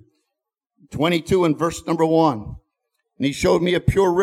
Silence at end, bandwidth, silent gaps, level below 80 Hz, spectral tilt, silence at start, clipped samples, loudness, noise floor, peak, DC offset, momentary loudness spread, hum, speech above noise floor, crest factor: 0 s; 15 kHz; none; -40 dBFS; -6 dB/octave; 0.9 s; under 0.1%; -19 LUFS; -82 dBFS; -4 dBFS; under 0.1%; 9 LU; none; 64 dB; 16 dB